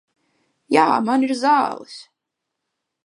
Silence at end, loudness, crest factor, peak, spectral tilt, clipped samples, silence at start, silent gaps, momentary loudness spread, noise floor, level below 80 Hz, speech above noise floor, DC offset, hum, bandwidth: 1 s; -18 LUFS; 20 dB; -2 dBFS; -4.5 dB/octave; under 0.1%; 0.7 s; none; 20 LU; -81 dBFS; -76 dBFS; 63 dB; under 0.1%; none; 11.5 kHz